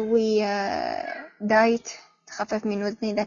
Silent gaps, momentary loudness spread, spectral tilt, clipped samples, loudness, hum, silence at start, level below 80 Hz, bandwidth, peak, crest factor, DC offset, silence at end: none; 16 LU; -5 dB/octave; under 0.1%; -25 LUFS; none; 0 s; -64 dBFS; 7.2 kHz; -8 dBFS; 18 dB; under 0.1%; 0 s